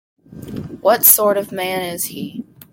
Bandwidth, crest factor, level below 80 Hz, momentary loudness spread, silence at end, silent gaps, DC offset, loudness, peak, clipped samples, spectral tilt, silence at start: 17 kHz; 18 dB; -56 dBFS; 21 LU; 0.3 s; none; under 0.1%; -15 LUFS; 0 dBFS; under 0.1%; -2.5 dB/octave; 0.3 s